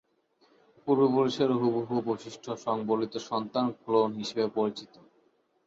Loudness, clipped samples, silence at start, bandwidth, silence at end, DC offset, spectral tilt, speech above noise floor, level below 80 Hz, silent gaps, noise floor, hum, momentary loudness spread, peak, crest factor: -29 LUFS; under 0.1%; 0.85 s; 7.8 kHz; 0.8 s; under 0.1%; -6.5 dB/octave; 40 dB; -74 dBFS; none; -69 dBFS; none; 10 LU; -12 dBFS; 18 dB